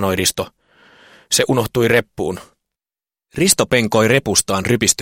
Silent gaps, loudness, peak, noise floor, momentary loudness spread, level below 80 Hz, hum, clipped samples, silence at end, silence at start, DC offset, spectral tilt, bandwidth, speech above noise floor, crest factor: none; -16 LUFS; 0 dBFS; under -90 dBFS; 12 LU; -46 dBFS; none; under 0.1%; 0 s; 0 s; under 0.1%; -3.5 dB/octave; 17 kHz; over 74 dB; 18 dB